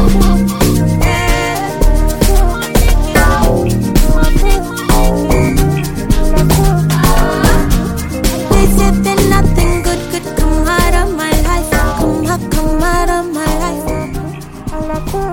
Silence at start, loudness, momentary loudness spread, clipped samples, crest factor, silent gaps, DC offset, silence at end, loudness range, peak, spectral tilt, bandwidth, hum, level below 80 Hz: 0 s; -13 LUFS; 7 LU; under 0.1%; 10 dB; none; under 0.1%; 0 s; 3 LU; 0 dBFS; -5.5 dB/octave; 17.5 kHz; none; -14 dBFS